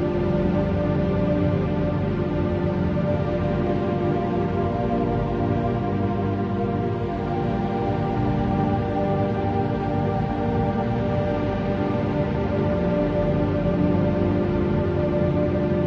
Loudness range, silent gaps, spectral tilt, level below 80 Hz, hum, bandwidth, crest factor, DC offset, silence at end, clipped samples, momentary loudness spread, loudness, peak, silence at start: 2 LU; none; -10 dB/octave; -36 dBFS; 50 Hz at -40 dBFS; 6.6 kHz; 14 dB; under 0.1%; 0 s; under 0.1%; 2 LU; -23 LUFS; -8 dBFS; 0 s